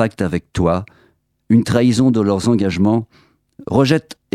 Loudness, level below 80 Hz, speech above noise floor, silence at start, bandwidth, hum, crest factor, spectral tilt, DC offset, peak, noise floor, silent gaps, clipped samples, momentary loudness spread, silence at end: -16 LUFS; -42 dBFS; 42 dB; 0 s; 13 kHz; none; 16 dB; -7 dB/octave; under 0.1%; 0 dBFS; -58 dBFS; none; under 0.1%; 7 LU; 0.2 s